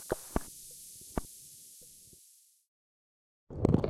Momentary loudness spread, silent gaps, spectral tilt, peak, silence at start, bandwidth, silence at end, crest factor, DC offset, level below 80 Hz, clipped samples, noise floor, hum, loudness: 20 LU; 2.68-3.47 s; -6.5 dB/octave; -10 dBFS; 0 s; 16.5 kHz; 0 s; 28 dB; under 0.1%; -50 dBFS; under 0.1%; -63 dBFS; none; -39 LUFS